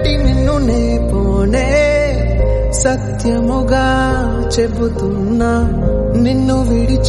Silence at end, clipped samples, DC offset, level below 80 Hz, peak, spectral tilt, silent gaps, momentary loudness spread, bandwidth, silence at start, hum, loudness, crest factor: 0 s; under 0.1%; under 0.1%; -18 dBFS; -2 dBFS; -6 dB/octave; none; 3 LU; 11.5 kHz; 0 s; none; -14 LUFS; 12 dB